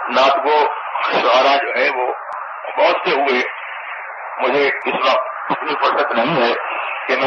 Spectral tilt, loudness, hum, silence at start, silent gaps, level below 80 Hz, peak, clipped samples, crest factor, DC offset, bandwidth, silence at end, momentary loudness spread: -4.5 dB/octave; -17 LUFS; none; 0 s; none; -68 dBFS; -2 dBFS; under 0.1%; 16 dB; under 0.1%; 7.2 kHz; 0 s; 13 LU